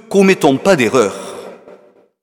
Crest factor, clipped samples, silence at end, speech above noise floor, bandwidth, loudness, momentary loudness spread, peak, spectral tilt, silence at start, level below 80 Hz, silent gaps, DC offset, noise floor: 14 dB; under 0.1%; 0.7 s; 34 dB; 16.5 kHz; -12 LUFS; 18 LU; 0 dBFS; -5 dB/octave; 0.1 s; -54 dBFS; none; under 0.1%; -45 dBFS